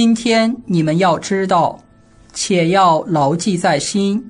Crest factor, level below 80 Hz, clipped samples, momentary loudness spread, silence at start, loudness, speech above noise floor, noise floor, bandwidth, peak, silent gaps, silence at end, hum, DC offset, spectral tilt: 14 dB; -52 dBFS; under 0.1%; 5 LU; 0 s; -15 LUFS; 31 dB; -45 dBFS; 10.5 kHz; 0 dBFS; none; 0 s; none; under 0.1%; -5 dB/octave